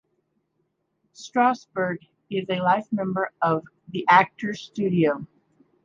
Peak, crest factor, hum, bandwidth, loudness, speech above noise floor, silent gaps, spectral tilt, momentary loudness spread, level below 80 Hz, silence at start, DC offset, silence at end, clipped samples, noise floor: -2 dBFS; 22 dB; none; 7.6 kHz; -23 LUFS; 50 dB; none; -6.5 dB/octave; 14 LU; -68 dBFS; 1.2 s; under 0.1%; 0.6 s; under 0.1%; -74 dBFS